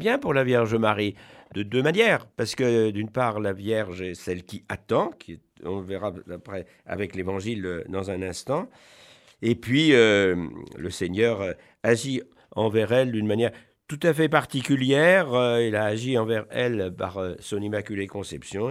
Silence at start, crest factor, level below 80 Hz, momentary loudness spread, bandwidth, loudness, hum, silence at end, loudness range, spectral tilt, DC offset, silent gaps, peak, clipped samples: 0 s; 22 dB; -60 dBFS; 15 LU; 15 kHz; -24 LUFS; none; 0 s; 9 LU; -5.5 dB/octave; under 0.1%; none; -4 dBFS; under 0.1%